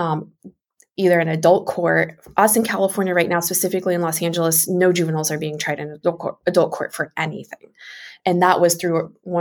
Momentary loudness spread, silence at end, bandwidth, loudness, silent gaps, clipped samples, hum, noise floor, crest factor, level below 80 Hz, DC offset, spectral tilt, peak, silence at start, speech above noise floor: 10 LU; 0 s; 18 kHz; -19 LUFS; none; under 0.1%; none; -54 dBFS; 18 dB; -64 dBFS; under 0.1%; -4.5 dB/octave; -2 dBFS; 0 s; 34 dB